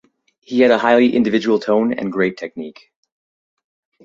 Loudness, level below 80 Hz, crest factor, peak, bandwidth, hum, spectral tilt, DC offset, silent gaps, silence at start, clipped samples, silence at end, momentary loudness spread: -16 LUFS; -62 dBFS; 16 dB; -2 dBFS; 7.4 kHz; none; -6.5 dB/octave; under 0.1%; none; 0.5 s; under 0.1%; 1.35 s; 16 LU